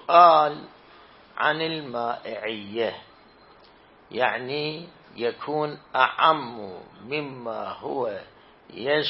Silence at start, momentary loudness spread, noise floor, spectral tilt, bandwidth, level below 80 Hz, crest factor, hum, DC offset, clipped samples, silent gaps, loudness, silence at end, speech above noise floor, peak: 0.1 s; 20 LU; -53 dBFS; -8.5 dB/octave; 5.8 kHz; -68 dBFS; 22 dB; none; under 0.1%; under 0.1%; none; -24 LUFS; 0 s; 29 dB; -2 dBFS